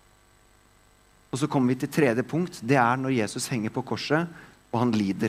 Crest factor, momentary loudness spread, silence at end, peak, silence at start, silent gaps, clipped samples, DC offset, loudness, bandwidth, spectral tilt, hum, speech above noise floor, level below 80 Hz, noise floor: 20 dB; 8 LU; 0 s; -6 dBFS; 1.35 s; none; under 0.1%; under 0.1%; -26 LUFS; 16 kHz; -6 dB/octave; 50 Hz at -60 dBFS; 34 dB; -64 dBFS; -59 dBFS